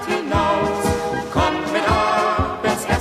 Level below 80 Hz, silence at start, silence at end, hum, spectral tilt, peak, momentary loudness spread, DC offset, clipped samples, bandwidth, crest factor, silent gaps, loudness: -34 dBFS; 0 s; 0 s; none; -5 dB/octave; -4 dBFS; 4 LU; under 0.1%; under 0.1%; 15.5 kHz; 14 dB; none; -19 LUFS